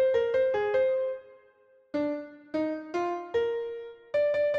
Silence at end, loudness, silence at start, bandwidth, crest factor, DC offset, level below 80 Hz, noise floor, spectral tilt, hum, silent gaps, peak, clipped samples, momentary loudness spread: 0 s; -29 LUFS; 0 s; 7.2 kHz; 14 dB; under 0.1%; -66 dBFS; -61 dBFS; -6 dB/octave; none; none; -16 dBFS; under 0.1%; 11 LU